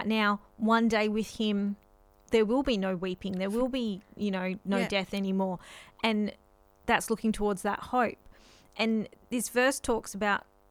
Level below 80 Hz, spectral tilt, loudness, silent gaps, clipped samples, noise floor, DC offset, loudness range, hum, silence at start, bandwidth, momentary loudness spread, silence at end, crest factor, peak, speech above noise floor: -54 dBFS; -4.5 dB/octave; -30 LUFS; none; under 0.1%; -56 dBFS; under 0.1%; 2 LU; none; 0 s; 16 kHz; 9 LU; 0.3 s; 20 dB; -10 dBFS; 27 dB